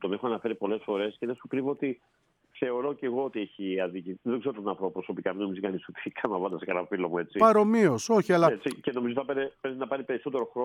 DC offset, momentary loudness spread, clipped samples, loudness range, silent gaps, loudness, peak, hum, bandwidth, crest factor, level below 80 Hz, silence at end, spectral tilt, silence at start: under 0.1%; 11 LU; under 0.1%; 7 LU; none; -29 LUFS; -6 dBFS; none; 14 kHz; 22 dB; -74 dBFS; 0 s; -6 dB/octave; 0 s